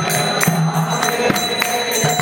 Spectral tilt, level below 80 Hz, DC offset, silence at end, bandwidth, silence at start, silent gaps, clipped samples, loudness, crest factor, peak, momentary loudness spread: -3.5 dB/octave; -52 dBFS; under 0.1%; 0 s; 18 kHz; 0 s; none; under 0.1%; -17 LUFS; 16 dB; -2 dBFS; 2 LU